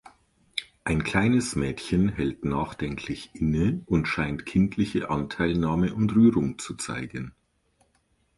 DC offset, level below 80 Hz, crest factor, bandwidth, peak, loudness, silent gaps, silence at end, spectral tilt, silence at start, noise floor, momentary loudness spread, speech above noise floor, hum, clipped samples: under 0.1%; -44 dBFS; 18 dB; 11.5 kHz; -8 dBFS; -26 LUFS; none; 1.1 s; -6 dB/octave; 0.55 s; -69 dBFS; 12 LU; 43 dB; none; under 0.1%